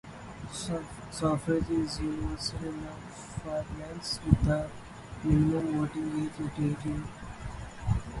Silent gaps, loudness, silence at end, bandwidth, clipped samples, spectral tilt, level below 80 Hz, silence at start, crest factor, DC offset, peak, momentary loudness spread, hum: none; -32 LUFS; 0 s; 11.5 kHz; under 0.1%; -6.5 dB/octave; -42 dBFS; 0.05 s; 26 dB; under 0.1%; -6 dBFS; 16 LU; none